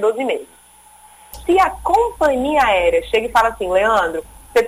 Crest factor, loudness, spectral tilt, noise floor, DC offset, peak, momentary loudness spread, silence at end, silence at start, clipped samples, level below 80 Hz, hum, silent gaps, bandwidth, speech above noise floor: 14 dB; -17 LUFS; -4 dB/octave; -46 dBFS; under 0.1%; -4 dBFS; 8 LU; 0 s; 0 s; under 0.1%; -40 dBFS; 60 Hz at -55 dBFS; none; 16 kHz; 30 dB